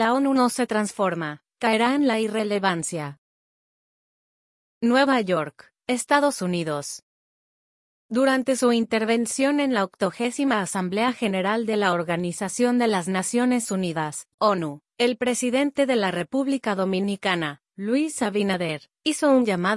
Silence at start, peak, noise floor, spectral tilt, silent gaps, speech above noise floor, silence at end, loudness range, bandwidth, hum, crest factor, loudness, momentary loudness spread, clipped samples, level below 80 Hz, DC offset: 0 s; -6 dBFS; under -90 dBFS; -4.5 dB/octave; 3.18-4.81 s, 7.03-8.09 s, 14.34-14.38 s; over 67 dB; 0 s; 3 LU; 12 kHz; none; 16 dB; -23 LUFS; 8 LU; under 0.1%; -70 dBFS; under 0.1%